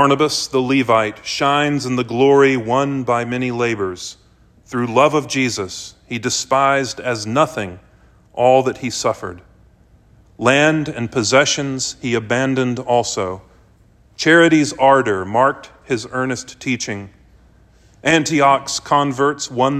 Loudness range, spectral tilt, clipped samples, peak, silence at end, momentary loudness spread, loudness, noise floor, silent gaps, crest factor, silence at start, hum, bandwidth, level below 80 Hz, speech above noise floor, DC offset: 4 LU; -4 dB/octave; under 0.1%; 0 dBFS; 0 s; 11 LU; -17 LUFS; -51 dBFS; none; 18 dB; 0 s; none; 14 kHz; -54 dBFS; 34 dB; under 0.1%